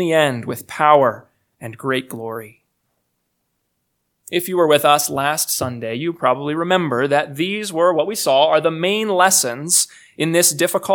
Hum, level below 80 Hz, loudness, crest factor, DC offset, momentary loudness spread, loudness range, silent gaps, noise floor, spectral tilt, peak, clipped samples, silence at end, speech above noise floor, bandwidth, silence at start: none; -66 dBFS; -17 LUFS; 18 dB; under 0.1%; 13 LU; 7 LU; none; -72 dBFS; -3 dB/octave; 0 dBFS; under 0.1%; 0 s; 54 dB; 19 kHz; 0 s